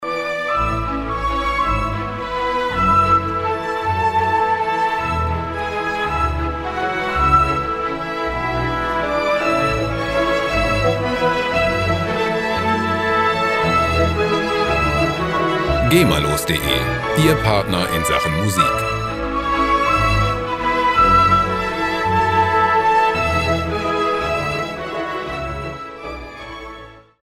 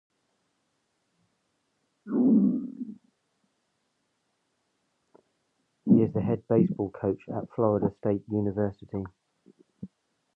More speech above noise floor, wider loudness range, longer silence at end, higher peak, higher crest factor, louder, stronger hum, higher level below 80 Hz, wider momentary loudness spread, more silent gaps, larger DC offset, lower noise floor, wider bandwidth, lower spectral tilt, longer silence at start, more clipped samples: second, 22 dB vs 48 dB; about the same, 4 LU vs 4 LU; second, 0.25 s vs 0.5 s; first, 0 dBFS vs -10 dBFS; about the same, 18 dB vs 20 dB; first, -18 LUFS vs -27 LUFS; neither; first, -32 dBFS vs -60 dBFS; second, 8 LU vs 19 LU; neither; neither; second, -39 dBFS vs -76 dBFS; first, 16 kHz vs 3 kHz; second, -5 dB/octave vs -12 dB/octave; second, 0 s vs 2.05 s; neither